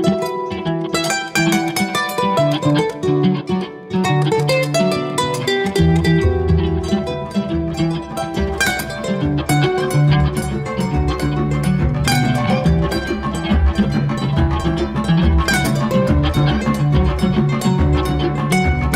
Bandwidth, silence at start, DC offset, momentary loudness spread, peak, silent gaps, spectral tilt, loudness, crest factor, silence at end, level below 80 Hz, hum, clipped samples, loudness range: 16 kHz; 0 s; under 0.1%; 6 LU; -4 dBFS; none; -6 dB/octave; -17 LUFS; 12 dB; 0 s; -26 dBFS; none; under 0.1%; 2 LU